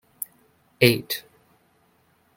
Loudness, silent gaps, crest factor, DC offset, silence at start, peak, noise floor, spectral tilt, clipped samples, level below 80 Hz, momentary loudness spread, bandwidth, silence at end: -23 LUFS; none; 26 dB; under 0.1%; 0.8 s; -2 dBFS; -63 dBFS; -4.5 dB/octave; under 0.1%; -62 dBFS; 17 LU; 17 kHz; 1.15 s